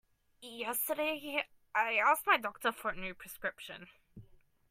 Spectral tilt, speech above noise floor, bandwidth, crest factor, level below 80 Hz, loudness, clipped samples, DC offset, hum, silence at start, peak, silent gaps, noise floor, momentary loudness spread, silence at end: -2 dB/octave; 27 dB; 16 kHz; 22 dB; -66 dBFS; -33 LUFS; under 0.1%; under 0.1%; none; 0.4 s; -14 dBFS; none; -61 dBFS; 19 LU; 0.45 s